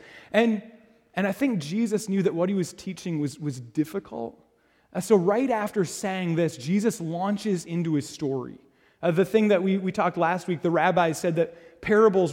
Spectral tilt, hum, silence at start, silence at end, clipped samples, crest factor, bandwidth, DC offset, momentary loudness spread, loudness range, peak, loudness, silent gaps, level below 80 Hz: -6 dB/octave; none; 0.1 s; 0 s; under 0.1%; 18 dB; 16.5 kHz; under 0.1%; 12 LU; 4 LU; -8 dBFS; -25 LUFS; none; -64 dBFS